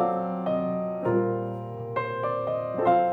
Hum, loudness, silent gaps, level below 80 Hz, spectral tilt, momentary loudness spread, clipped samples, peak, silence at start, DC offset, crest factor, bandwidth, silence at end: none; -28 LUFS; none; -64 dBFS; -10 dB/octave; 7 LU; under 0.1%; -10 dBFS; 0 s; under 0.1%; 18 dB; 4.7 kHz; 0 s